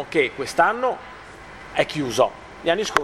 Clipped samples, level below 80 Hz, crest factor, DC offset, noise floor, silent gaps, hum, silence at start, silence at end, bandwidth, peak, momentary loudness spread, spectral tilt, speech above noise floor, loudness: under 0.1%; -52 dBFS; 22 dB; under 0.1%; -41 dBFS; none; none; 0 s; 0 s; 16.5 kHz; 0 dBFS; 20 LU; -3.5 dB/octave; 19 dB; -22 LUFS